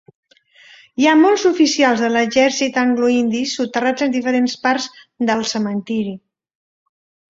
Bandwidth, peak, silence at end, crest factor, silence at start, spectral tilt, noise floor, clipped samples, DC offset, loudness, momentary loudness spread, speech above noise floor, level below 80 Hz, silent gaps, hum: 7.8 kHz; -2 dBFS; 1.1 s; 16 dB; 1 s; -3.5 dB/octave; -49 dBFS; under 0.1%; under 0.1%; -16 LUFS; 10 LU; 32 dB; -62 dBFS; none; none